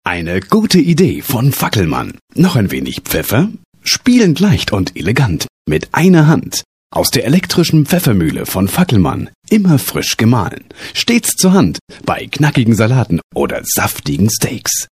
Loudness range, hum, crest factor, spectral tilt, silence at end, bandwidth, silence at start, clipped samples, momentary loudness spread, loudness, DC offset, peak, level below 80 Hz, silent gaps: 1 LU; none; 12 dB; -5 dB/octave; 0.1 s; 15.5 kHz; 0.05 s; under 0.1%; 9 LU; -13 LUFS; under 0.1%; 0 dBFS; -38 dBFS; 2.21-2.28 s, 3.65-3.72 s, 5.49-5.65 s, 6.65-6.90 s, 9.35-9.42 s, 11.81-11.87 s, 13.24-13.30 s